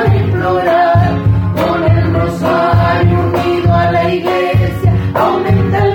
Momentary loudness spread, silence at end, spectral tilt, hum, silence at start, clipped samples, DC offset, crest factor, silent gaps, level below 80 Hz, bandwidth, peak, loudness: 3 LU; 0 s; -8 dB/octave; none; 0 s; under 0.1%; under 0.1%; 10 dB; none; -28 dBFS; 17 kHz; 0 dBFS; -12 LUFS